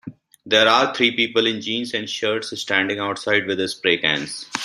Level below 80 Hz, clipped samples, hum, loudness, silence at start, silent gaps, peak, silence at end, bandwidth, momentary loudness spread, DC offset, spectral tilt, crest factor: -64 dBFS; under 0.1%; none; -19 LUFS; 0.05 s; none; -2 dBFS; 0 s; 14 kHz; 9 LU; under 0.1%; -3 dB/octave; 20 dB